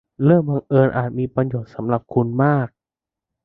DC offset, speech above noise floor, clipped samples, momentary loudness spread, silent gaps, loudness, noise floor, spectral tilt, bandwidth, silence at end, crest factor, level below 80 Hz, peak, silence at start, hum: under 0.1%; 70 dB; under 0.1%; 8 LU; none; -19 LUFS; -88 dBFS; -12 dB/octave; 4 kHz; 0.8 s; 18 dB; -52 dBFS; -2 dBFS; 0.2 s; none